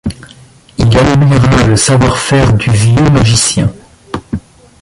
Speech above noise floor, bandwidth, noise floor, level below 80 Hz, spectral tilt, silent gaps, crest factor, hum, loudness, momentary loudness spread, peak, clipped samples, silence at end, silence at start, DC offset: 30 dB; 11.5 kHz; -38 dBFS; -26 dBFS; -5 dB/octave; none; 10 dB; none; -9 LUFS; 16 LU; 0 dBFS; under 0.1%; 0.45 s; 0.05 s; under 0.1%